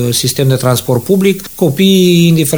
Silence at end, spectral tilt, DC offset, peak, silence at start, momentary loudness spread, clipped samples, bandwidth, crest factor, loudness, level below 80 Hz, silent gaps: 0 s; -5.5 dB/octave; 0.7%; 0 dBFS; 0 s; 6 LU; under 0.1%; over 20 kHz; 10 dB; -10 LUFS; -44 dBFS; none